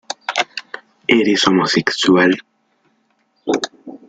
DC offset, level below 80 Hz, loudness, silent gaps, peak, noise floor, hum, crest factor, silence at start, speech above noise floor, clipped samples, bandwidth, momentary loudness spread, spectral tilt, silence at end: under 0.1%; -58 dBFS; -16 LUFS; none; 0 dBFS; -63 dBFS; none; 18 dB; 0.1 s; 49 dB; under 0.1%; 9.2 kHz; 15 LU; -4 dB/octave; 0.15 s